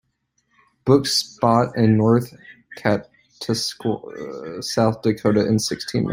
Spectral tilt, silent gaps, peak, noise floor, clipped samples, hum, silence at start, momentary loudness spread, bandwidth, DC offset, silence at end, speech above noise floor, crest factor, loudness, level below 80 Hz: -5.5 dB/octave; none; -2 dBFS; -70 dBFS; under 0.1%; none; 0.85 s; 15 LU; 16 kHz; under 0.1%; 0 s; 50 dB; 18 dB; -20 LUFS; -54 dBFS